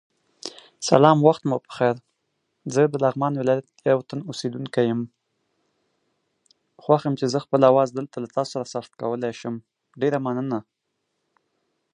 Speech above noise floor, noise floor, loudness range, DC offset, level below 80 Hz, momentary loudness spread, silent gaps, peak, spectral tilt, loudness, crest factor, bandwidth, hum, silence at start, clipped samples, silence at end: 55 dB; -77 dBFS; 7 LU; under 0.1%; -68 dBFS; 16 LU; none; 0 dBFS; -6 dB/octave; -22 LUFS; 24 dB; 11 kHz; none; 0.45 s; under 0.1%; 1.3 s